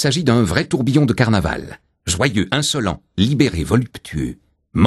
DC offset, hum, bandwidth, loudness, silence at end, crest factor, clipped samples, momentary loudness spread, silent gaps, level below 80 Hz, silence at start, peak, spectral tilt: under 0.1%; none; 13 kHz; -18 LUFS; 0 s; 18 dB; under 0.1%; 11 LU; none; -36 dBFS; 0 s; 0 dBFS; -5 dB/octave